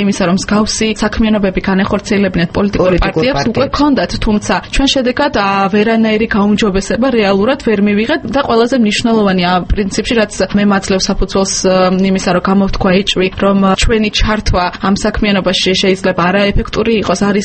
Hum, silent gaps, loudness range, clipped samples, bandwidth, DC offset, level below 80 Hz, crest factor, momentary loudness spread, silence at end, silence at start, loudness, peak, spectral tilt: none; none; 1 LU; under 0.1%; 8.8 kHz; under 0.1%; -24 dBFS; 12 dB; 3 LU; 0 s; 0 s; -12 LUFS; 0 dBFS; -5 dB/octave